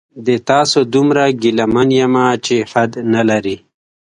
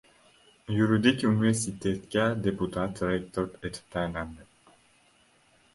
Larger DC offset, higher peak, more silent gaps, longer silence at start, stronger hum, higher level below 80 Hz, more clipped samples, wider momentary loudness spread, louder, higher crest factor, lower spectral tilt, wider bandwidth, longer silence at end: neither; first, 0 dBFS vs -8 dBFS; neither; second, 0.15 s vs 0.7 s; neither; about the same, -50 dBFS vs -54 dBFS; neither; second, 6 LU vs 12 LU; first, -14 LUFS vs -28 LUFS; second, 14 dB vs 22 dB; about the same, -5 dB/octave vs -5.5 dB/octave; about the same, 11 kHz vs 11.5 kHz; second, 0.6 s vs 1.3 s